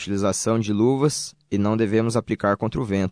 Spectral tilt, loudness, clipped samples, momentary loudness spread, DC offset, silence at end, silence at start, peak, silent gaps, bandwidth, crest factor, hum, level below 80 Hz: -5.5 dB/octave; -22 LUFS; under 0.1%; 5 LU; under 0.1%; 0 s; 0 s; -6 dBFS; none; 11 kHz; 16 dB; none; -50 dBFS